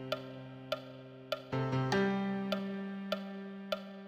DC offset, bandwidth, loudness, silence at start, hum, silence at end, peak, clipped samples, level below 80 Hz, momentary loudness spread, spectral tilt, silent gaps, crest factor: under 0.1%; 15 kHz; -37 LUFS; 0 s; none; 0 s; -20 dBFS; under 0.1%; -70 dBFS; 14 LU; -6.5 dB/octave; none; 18 dB